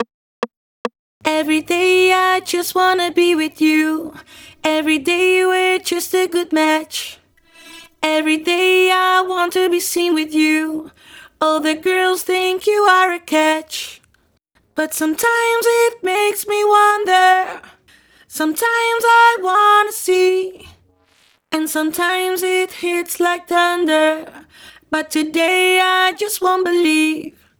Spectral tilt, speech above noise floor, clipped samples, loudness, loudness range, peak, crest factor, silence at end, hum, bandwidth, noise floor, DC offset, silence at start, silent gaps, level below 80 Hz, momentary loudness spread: -1.5 dB/octave; 45 dB; under 0.1%; -15 LUFS; 3 LU; 0 dBFS; 16 dB; 0.3 s; none; over 20 kHz; -60 dBFS; under 0.1%; 0 s; 0.14-0.42 s, 0.57-0.85 s, 0.99-1.20 s; -62 dBFS; 13 LU